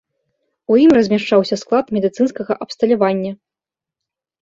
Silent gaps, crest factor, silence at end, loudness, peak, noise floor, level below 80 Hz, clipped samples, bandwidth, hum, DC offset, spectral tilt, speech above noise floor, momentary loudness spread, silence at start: none; 16 dB; 1.15 s; -16 LUFS; -2 dBFS; -87 dBFS; -58 dBFS; under 0.1%; 7.8 kHz; none; under 0.1%; -6.5 dB/octave; 72 dB; 12 LU; 0.7 s